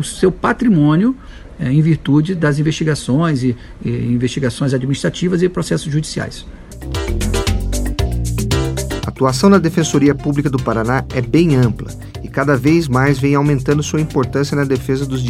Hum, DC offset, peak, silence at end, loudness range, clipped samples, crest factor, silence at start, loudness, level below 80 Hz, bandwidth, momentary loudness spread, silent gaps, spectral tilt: none; under 0.1%; 0 dBFS; 0 s; 5 LU; under 0.1%; 16 dB; 0 s; -16 LUFS; -28 dBFS; 16 kHz; 10 LU; none; -6.5 dB/octave